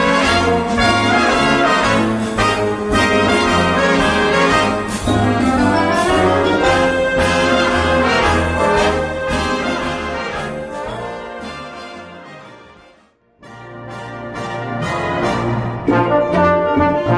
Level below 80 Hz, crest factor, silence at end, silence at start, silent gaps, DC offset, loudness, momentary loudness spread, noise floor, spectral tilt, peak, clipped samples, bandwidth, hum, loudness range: -34 dBFS; 14 dB; 0 s; 0 s; none; under 0.1%; -15 LUFS; 15 LU; -53 dBFS; -5 dB/octave; -2 dBFS; under 0.1%; 11 kHz; none; 15 LU